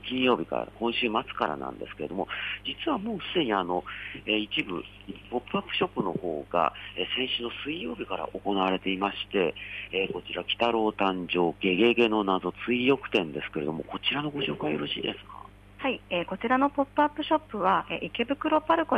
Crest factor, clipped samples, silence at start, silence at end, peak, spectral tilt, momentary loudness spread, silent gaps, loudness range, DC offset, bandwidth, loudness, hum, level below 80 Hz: 18 dB; under 0.1%; 0 s; 0 s; -10 dBFS; -6.5 dB/octave; 9 LU; none; 4 LU; under 0.1%; 9.6 kHz; -28 LUFS; 50 Hz at -55 dBFS; -56 dBFS